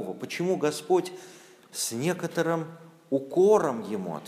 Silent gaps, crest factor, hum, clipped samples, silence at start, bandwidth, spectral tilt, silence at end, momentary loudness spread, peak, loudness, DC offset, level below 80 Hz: none; 18 dB; none; under 0.1%; 0 s; 15.5 kHz; -5 dB/octave; 0 s; 15 LU; -10 dBFS; -27 LUFS; under 0.1%; -78 dBFS